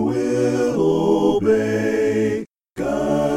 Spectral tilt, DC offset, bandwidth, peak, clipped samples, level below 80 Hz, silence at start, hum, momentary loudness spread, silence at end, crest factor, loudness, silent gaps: -6.5 dB/octave; under 0.1%; 14.5 kHz; -6 dBFS; under 0.1%; -48 dBFS; 0 s; none; 8 LU; 0 s; 14 dB; -19 LUFS; none